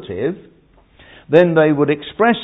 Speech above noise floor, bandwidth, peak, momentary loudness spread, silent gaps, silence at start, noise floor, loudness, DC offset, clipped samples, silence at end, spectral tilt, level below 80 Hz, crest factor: 34 dB; 4.9 kHz; 0 dBFS; 11 LU; none; 0 s; -49 dBFS; -15 LUFS; under 0.1%; under 0.1%; 0 s; -9 dB/octave; -52 dBFS; 16 dB